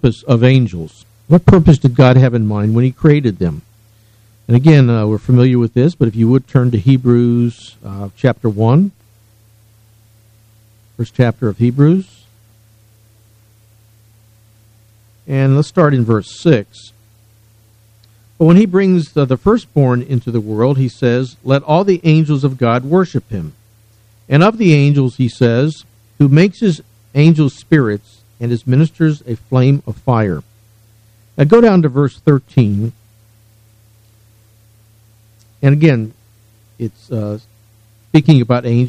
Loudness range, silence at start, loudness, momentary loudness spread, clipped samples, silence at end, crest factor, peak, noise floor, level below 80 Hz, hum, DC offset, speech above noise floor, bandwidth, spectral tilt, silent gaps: 7 LU; 0.05 s; -13 LUFS; 14 LU; 0.2%; 0 s; 14 dB; 0 dBFS; -49 dBFS; -40 dBFS; none; under 0.1%; 37 dB; 8.8 kHz; -8.5 dB/octave; none